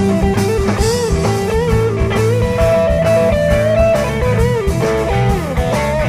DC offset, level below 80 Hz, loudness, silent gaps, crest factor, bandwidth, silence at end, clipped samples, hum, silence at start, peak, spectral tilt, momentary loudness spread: 0.5%; -22 dBFS; -14 LUFS; none; 12 dB; 16 kHz; 0 s; under 0.1%; none; 0 s; 0 dBFS; -6.5 dB/octave; 3 LU